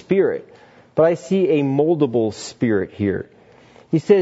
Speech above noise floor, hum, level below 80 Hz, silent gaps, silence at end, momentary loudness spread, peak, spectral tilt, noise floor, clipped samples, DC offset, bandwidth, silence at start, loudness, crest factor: 30 dB; none; -60 dBFS; none; 0 s; 9 LU; -2 dBFS; -7 dB/octave; -48 dBFS; under 0.1%; under 0.1%; 8 kHz; 0.1 s; -20 LUFS; 18 dB